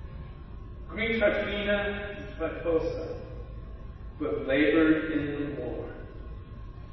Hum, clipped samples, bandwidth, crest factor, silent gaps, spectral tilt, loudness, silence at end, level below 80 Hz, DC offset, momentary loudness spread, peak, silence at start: none; under 0.1%; 6 kHz; 18 dB; none; -8 dB/octave; -29 LUFS; 0 s; -42 dBFS; under 0.1%; 20 LU; -12 dBFS; 0 s